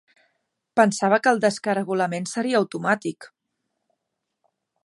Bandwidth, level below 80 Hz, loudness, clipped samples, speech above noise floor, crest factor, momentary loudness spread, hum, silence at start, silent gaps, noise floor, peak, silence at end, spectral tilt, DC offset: 11.5 kHz; -76 dBFS; -22 LUFS; under 0.1%; 59 dB; 22 dB; 8 LU; none; 0.75 s; none; -81 dBFS; -2 dBFS; 1.6 s; -5 dB/octave; under 0.1%